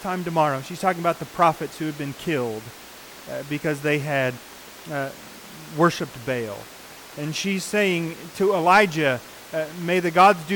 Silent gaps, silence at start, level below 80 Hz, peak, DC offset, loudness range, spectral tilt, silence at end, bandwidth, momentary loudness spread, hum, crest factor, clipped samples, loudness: none; 0 s; -60 dBFS; -6 dBFS; under 0.1%; 6 LU; -5 dB/octave; 0 s; 19 kHz; 23 LU; none; 18 dB; under 0.1%; -23 LUFS